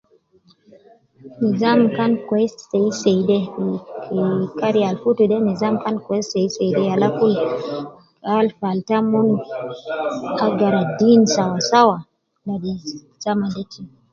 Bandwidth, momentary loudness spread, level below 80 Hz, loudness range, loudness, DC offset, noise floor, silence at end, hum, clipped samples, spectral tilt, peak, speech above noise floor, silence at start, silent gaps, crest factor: 7.6 kHz; 14 LU; -60 dBFS; 3 LU; -19 LUFS; under 0.1%; -56 dBFS; 0.25 s; none; under 0.1%; -6 dB/octave; 0 dBFS; 38 dB; 1.25 s; none; 18 dB